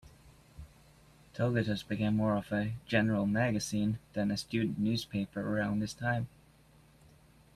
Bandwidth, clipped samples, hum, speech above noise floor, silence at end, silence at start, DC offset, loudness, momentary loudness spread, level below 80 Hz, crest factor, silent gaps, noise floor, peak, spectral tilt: 13.5 kHz; under 0.1%; none; 30 dB; 1.25 s; 0.05 s; under 0.1%; -33 LUFS; 6 LU; -60 dBFS; 20 dB; none; -62 dBFS; -14 dBFS; -6 dB/octave